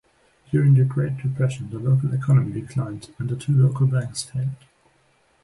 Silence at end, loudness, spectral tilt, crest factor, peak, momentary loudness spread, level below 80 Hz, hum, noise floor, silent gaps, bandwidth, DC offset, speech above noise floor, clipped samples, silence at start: 0.9 s; -22 LUFS; -7.5 dB/octave; 14 dB; -8 dBFS; 11 LU; -54 dBFS; none; -62 dBFS; none; 11.5 kHz; under 0.1%; 41 dB; under 0.1%; 0.5 s